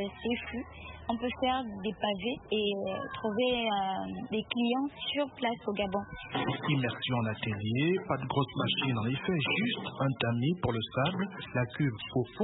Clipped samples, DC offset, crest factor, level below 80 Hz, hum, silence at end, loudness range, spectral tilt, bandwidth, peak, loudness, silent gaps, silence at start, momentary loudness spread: under 0.1%; under 0.1%; 18 dB; -58 dBFS; none; 0 s; 2 LU; -10 dB/octave; 4.1 kHz; -14 dBFS; -32 LUFS; none; 0 s; 6 LU